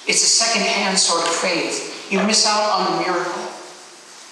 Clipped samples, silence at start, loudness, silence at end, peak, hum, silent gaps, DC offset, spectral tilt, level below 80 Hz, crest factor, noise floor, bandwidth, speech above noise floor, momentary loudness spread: under 0.1%; 0 s; -17 LUFS; 0 s; -2 dBFS; none; none; under 0.1%; -1.5 dB/octave; -76 dBFS; 16 dB; -41 dBFS; 13 kHz; 23 dB; 14 LU